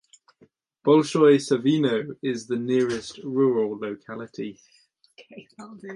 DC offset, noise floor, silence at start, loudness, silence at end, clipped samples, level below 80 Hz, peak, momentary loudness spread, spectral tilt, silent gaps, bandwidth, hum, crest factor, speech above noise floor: under 0.1%; -61 dBFS; 0.85 s; -23 LUFS; 0 s; under 0.1%; -70 dBFS; -6 dBFS; 18 LU; -6 dB/octave; none; 11 kHz; none; 18 dB; 37 dB